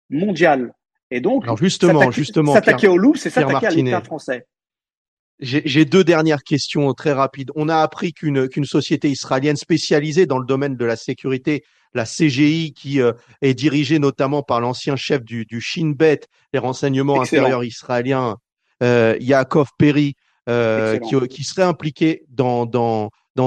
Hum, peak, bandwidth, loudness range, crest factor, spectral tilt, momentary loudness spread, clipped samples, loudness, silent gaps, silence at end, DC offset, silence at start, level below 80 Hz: none; -2 dBFS; 10 kHz; 4 LU; 16 dB; -6 dB/octave; 9 LU; under 0.1%; -18 LUFS; 1.03-1.10 s, 4.97-5.38 s, 18.52-18.57 s, 23.30-23.35 s; 0 s; under 0.1%; 0.1 s; -60 dBFS